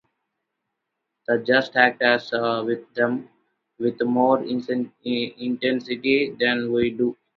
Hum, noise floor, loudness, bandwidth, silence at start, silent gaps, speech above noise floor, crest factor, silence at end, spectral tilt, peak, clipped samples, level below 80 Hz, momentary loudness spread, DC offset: none; -80 dBFS; -22 LUFS; 6.2 kHz; 1.3 s; none; 58 dB; 22 dB; 0.25 s; -6.5 dB/octave; -2 dBFS; under 0.1%; -64 dBFS; 9 LU; under 0.1%